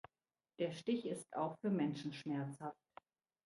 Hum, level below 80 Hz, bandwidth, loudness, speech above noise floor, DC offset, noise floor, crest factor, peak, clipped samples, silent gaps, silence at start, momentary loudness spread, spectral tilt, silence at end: none; -86 dBFS; 11.5 kHz; -42 LUFS; over 49 dB; under 0.1%; under -90 dBFS; 18 dB; -26 dBFS; under 0.1%; none; 0.6 s; 10 LU; -6.5 dB/octave; 0.75 s